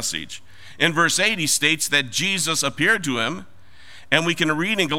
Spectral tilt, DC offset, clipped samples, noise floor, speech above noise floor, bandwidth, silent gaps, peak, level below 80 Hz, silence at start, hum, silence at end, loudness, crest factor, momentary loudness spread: -2 dB/octave; 1%; under 0.1%; -48 dBFS; 26 dB; 16.5 kHz; none; 0 dBFS; -60 dBFS; 0 s; none; 0 s; -19 LUFS; 22 dB; 9 LU